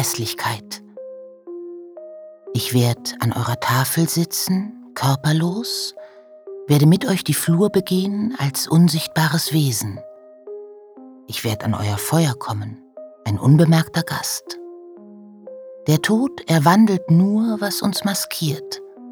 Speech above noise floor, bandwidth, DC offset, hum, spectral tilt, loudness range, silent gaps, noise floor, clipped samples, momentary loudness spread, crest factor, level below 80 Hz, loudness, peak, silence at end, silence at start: 24 dB; over 20 kHz; under 0.1%; none; -5 dB/octave; 6 LU; none; -42 dBFS; under 0.1%; 22 LU; 20 dB; -60 dBFS; -19 LUFS; 0 dBFS; 0 s; 0 s